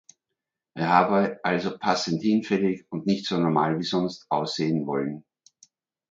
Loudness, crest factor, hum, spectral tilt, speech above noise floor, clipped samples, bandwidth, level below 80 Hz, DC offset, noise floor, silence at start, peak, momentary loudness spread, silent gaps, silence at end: -25 LUFS; 22 dB; none; -6 dB/octave; 61 dB; under 0.1%; 7.6 kHz; -66 dBFS; under 0.1%; -85 dBFS; 0.75 s; -4 dBFS; 8 LU; none; 0.9 s